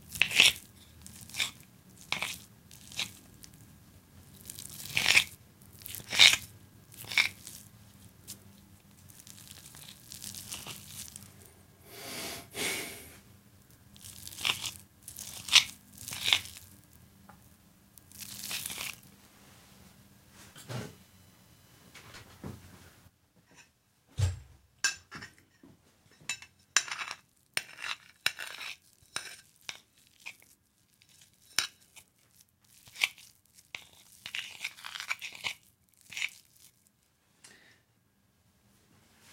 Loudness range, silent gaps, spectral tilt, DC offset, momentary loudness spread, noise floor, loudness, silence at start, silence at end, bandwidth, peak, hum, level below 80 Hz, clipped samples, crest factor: 18 LU; none; -0.5 dB/octave; under 0.1%; 27 LU; -70 dBFS; -30 LUFS; 0 s; 1.85 s; 17 kHz; -2 dBFS; none; -62 dBFS; under 0.1%; 34 dB